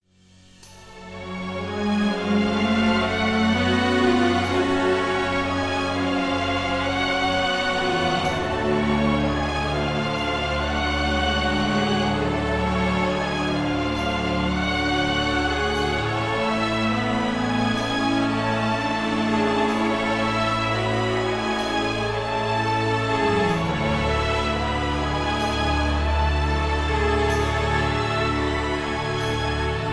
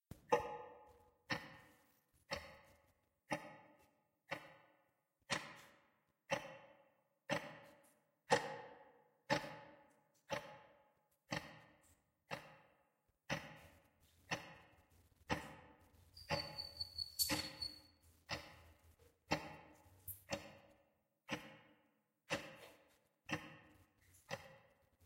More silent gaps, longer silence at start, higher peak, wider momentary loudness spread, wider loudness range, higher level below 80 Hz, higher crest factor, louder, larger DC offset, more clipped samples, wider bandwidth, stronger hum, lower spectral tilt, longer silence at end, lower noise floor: neither; first, 0.6 s vs 0.1 s; first, -8 dBFS vs -18 dBFS; second, 3 LU vs 23 LU; second, 2 LU vs 8 LU; first, -34 dBFS vs -72 dBFS; second, 14 dB vs 32 dB; first, -22 LUFS vs -45 LUFS; neither; neither; second, 11 kHz vs 16 kHz; neither; first, -5.5 dB/octave vs -3 dB/octave; about the same, 0 s vs 0 s; second, -53 dBFS vs -82 dBFS